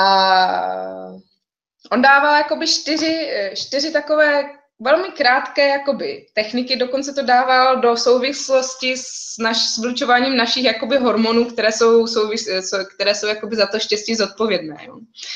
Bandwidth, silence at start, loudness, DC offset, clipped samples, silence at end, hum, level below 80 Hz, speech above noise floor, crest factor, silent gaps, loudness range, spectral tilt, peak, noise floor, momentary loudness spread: 9.4 kHz; 0 s; -17 LUFS; under 0.1%; under 0.1%; 0 s; none; -64 dBFS; 53 dB; 16 dB; none; 2 LU; -2 dB/octave; -2 dBFS; -70 dBFS; 10 LU